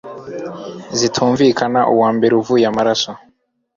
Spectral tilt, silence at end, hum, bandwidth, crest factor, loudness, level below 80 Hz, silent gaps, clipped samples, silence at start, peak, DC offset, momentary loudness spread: -4.5 dB/octave; 0.6 s; none; 7.6 kHz; 14 dB; -15 LUFS; -54 dBFS; none; under 0.1%; 0.05 s; -2 dBFS; under 0.1%; 15 LU